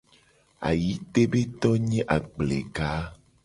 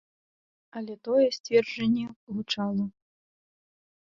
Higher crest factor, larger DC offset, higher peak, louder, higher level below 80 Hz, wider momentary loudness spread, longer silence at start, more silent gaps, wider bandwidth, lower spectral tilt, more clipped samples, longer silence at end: about the same, 20 dB vs 20 dB; neither; first, -6 dBFS vs -10 dBFS; about the same, -26 LUFS vs -28 LUFS; first, -44 dBFS vs -68 dBFS; second, 7 LU vs 14 LU; second, 0.6 s vs 0.75 s; second, none vs 1.40-1.44 s, 2.16-2.27 s; first, 11.5 kHz vs 7.4 kHz; first, -7 dB/octave vs -5.5 dB/octave; neither; second, 0.3 s vs 1.15 s